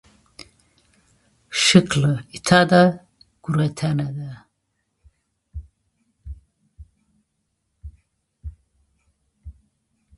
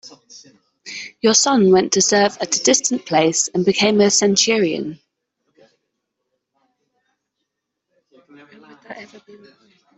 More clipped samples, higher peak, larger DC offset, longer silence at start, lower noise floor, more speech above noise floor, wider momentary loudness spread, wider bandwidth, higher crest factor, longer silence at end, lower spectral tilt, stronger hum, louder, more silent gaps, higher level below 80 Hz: neither; about the same, 0 dBFS vs -2 dBFS; neither; first, 1.5 s vs 0.05 s; second, -74 dBFS vs -78 dBFS; second, 56 dB vs 61 dB; first, 27 LU vs 19 LU; first, 11.5 kHz vs 8.4 kHz; first, 24 dB vs 18 dB; second, 0.65 s vs 0.8 s; first, -5 dB/octave vs -3 dB/octave; neither; second, -18 LUFS vs -15 LUFS; neither; first, -46 dBFS vs -64 dBFS